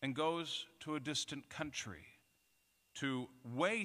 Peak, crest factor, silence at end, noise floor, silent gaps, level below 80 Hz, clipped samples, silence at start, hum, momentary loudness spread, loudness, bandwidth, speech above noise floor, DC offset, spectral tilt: -22 dBFS; 20 dB; 0 s; -77 dBFS; none; -76 dBFS; under 0.1%; 0 s; none; 10 LU; -41 LUFS; 15.5 kHz; 36 dB; under 0.1%; -3.5 dB/octave